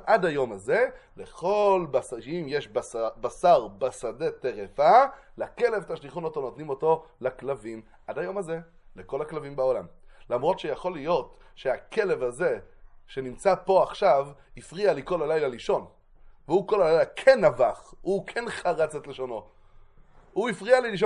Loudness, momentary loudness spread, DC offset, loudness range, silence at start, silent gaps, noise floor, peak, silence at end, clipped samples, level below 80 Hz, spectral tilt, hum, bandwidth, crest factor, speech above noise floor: -26 LUFS; 14 LU; under 0.1%; 7 LU; 0 s; none; -53 dBFS; -4 dBFS; 0 s; under 0.1%; -56 dBFS; -5.5 dB/octave; none; 11.5 kHz; 22 dB; 27 dB